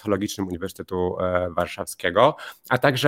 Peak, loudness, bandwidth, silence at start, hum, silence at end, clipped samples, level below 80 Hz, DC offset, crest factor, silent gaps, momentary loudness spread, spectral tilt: -2 dBFS; -24 LUFS; 17 kHz; 0.05 s; none; 0 s; under 0.1%; -54 dBFS; under 0.1%; 22 dB; none; 11 LU; -5 dB/octave